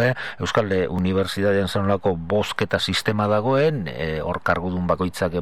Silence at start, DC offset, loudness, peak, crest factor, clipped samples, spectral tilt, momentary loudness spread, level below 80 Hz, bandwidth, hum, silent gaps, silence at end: 0 s; 0.9%; -22 LUFS; -4 dBFS; 18 dB; under 0.1%; -6 dB/octave; 5 LU; -46 dBFS; 15 kHz; none; none; 0 s